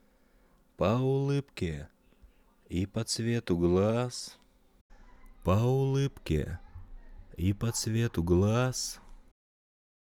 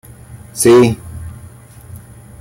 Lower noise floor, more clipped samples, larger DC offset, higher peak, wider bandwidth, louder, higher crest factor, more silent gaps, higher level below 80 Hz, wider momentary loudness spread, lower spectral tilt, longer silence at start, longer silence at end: first, -64 dBFS vs -37 dBFS; neither; neither; second, -14 dBFS vs -2 dBFS; about the same, 17 kHz vs 16.5 kHz; second, -30 LUFS vs -11 LUFS; about the same, 18 dB vs 14 dB; first, 4.81-4.90 s vs none; second, -48 dBFS vs -42 dBFS; second, 12 LU vs 22 LU; about the same, -6 dB/octave vs -5.5 dB/octave; first, 0.8 s vs 0.35 s; first, 0.85 s vs 0.45 s